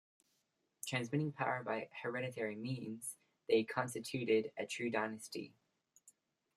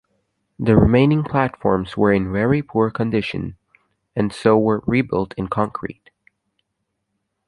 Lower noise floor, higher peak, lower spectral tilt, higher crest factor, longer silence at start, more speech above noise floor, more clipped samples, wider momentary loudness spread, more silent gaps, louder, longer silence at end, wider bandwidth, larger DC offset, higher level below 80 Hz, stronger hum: first, -83 dBFS vs -75 dBFS; second, -20 dBFS vs -2 dBFS; second, -5 dB/octave vs -8.5 dB/octave; about the same, 20 dB vs 18 dB; first, 0.85 s vs 0.6 s; second, 44 dB vs 57 dB; neither; about the same, 12 LU vs 11 LU; neither; second, -40 LUFS vs -19 LUFS; second, 0.45 s vs 1.55 s; first, 14.5 kHz vs 11 kHz; neither; second, -84 dBFS vs -40 dBFS; neither